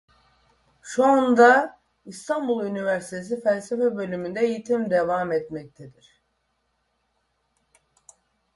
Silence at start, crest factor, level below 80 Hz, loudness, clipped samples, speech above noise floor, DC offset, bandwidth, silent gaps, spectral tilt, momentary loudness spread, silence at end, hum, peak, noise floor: 0.85 s; 22 dB; -66 dBFS; -22 LUFS; under 0.1%; 50 dB; under 0.1%; 11.5 kHz; none; -5.5 dB/octave; 16 LU; 2.65 s; none; -4 dBFS; -72 dBFS